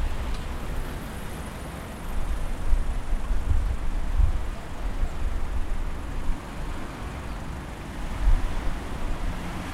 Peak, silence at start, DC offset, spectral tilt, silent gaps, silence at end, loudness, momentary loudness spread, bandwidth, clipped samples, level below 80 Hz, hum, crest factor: -8 dBFS; 0 s; under 0.1%; -6 dB/octave; none; 0 s; -33 LUFS; 8 LU; 13 kHz; under 0.1%; -28 dBFS; none; 18 dB